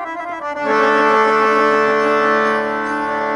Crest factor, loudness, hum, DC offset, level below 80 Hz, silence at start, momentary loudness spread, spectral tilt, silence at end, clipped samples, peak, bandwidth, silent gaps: 14 dB; -15 LUFS; none; under 0.1%; -58 dBFS; 0 s; 9 LU; -4.5 dB/octave; 0 s; under 0.1%; -2 dBFS; 11 kHz; none